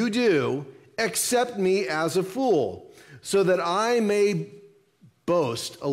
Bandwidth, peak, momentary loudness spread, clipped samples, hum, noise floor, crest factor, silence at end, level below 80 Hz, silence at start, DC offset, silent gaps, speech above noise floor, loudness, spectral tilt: 16 kHz; -12 dBFS; 11 LU; under 0.1%; none; -58 dBFS; 14 dB; 0 s; -68 dBFS; 0 s; under 0.1%; none; 34 dB; -24 LUFS; -4.5 dB/octave